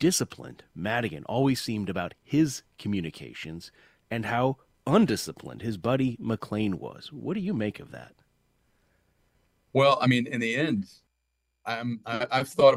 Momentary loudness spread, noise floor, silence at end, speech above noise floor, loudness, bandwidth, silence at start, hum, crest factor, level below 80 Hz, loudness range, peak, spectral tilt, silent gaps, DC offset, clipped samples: 17 LU; -78 dBFS; 0 s; 51 dB; -28 LUFS; 16 kHz; 0 s; none; 22 dB; -62 dBFS; 4 LU; -6 dBFS; -5.5 dB/octave; none; under 0.1%; under 0.1%